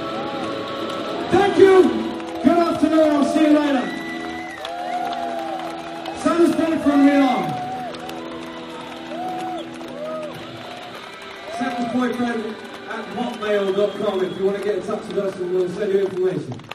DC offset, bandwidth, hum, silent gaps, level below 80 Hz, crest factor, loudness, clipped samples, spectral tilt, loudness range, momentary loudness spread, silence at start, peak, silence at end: under 0.1%; 13.5 kHz; none; none; -56 dBFS; 20 dB; -21 LUFS; under 0.1%; -5.5 dB/octave; 12 LU; 16 LU; 0 s; 0 dBFS; 0 s